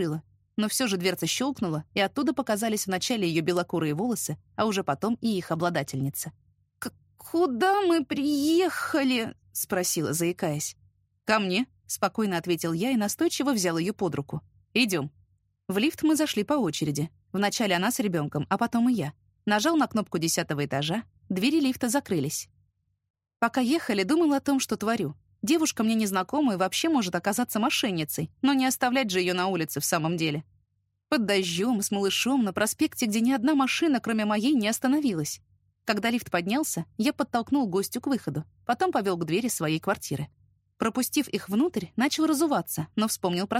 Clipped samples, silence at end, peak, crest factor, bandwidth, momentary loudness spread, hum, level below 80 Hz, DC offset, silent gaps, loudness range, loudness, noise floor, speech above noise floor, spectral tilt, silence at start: under 0.1%; 0 s; -8 dBFS; 18 dB; 16 kHz; 8 LU; none; -66 dBFS; under 0.1%; 23.10-23.14 s; 3 LU; -27 LUFS; -74 dBFS; 48 dB; -4 dB/octave; 0 s